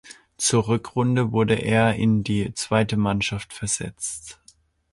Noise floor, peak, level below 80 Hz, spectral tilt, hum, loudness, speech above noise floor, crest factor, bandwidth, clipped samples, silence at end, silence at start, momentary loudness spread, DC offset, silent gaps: -57 dBFS; -6 dBFS; -48 dBFS; -5 dB/octave; none; -23 LUFS; 35 dB; 18 dB; 11.5 kHz; under 0.1%; 0.6 s; 0.05 s; 10 LU; under 0.1%; none